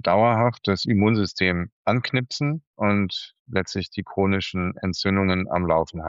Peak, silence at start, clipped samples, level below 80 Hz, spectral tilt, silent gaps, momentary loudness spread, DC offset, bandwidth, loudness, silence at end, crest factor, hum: -8 dBFS; 0.05 s; under 0.1%; -50 dBFS; -6.5 dB/octave; 1.72-1.85 s, 2.67-2.74 s, 3.39-3.46 s; 8 LU; under 0.1%; 7.8 kHz; -23 LUFS; 0 s; 16 dB; none